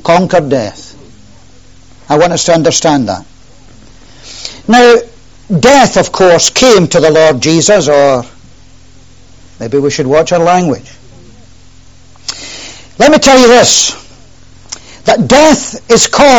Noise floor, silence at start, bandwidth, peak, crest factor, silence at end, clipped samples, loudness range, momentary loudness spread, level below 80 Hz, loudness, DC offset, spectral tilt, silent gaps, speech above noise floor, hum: -39 dBFS; 0.05 s; over 20 kHz; 0 dBFS; 10 dB; 0 s; 0.9%; 7 LU; 19 LU; -38 dBFS; -7 LUFS; 1%; -3.5 dB/octave; none; 33 dB; none